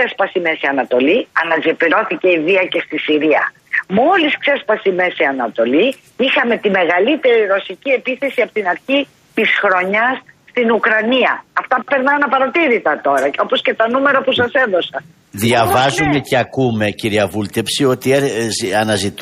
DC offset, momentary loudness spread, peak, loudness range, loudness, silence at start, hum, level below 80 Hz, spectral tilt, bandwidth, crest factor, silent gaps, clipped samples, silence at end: under 0.1%; 5 LU; -2 dBFS; 1 LU; -15 LUFS; 0 s; none; -52 dBFS; -4.5 dB/octave; 15 kHz; 14 dB; none; under 0.1%; 0 s